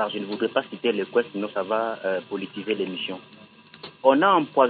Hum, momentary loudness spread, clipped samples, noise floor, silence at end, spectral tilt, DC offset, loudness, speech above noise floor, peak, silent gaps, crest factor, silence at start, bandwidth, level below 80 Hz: none; 14 LU; under 0.1%; -45 dBFS; 0 s; -9.5 dB/octave; under 0.1%; -25 LUFS; 22 dB; -4 dBFS; none; 20 dB; 0 s; 4.7 kHz; -78 dBFS